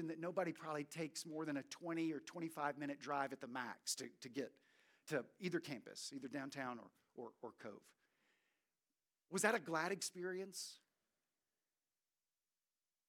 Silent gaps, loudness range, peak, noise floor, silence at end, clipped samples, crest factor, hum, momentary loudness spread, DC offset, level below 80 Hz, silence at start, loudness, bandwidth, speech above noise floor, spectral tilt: none; 6 LU; -20 dBFS; under -90 dBFS; 2.3 s; under 0.1%; 28 dB; none; 14 LU; under 0.1%; under -90 dBFS; 0 s; -45 LUFS; 18.5 kHz; over 44 dB; -3.5 dB/octave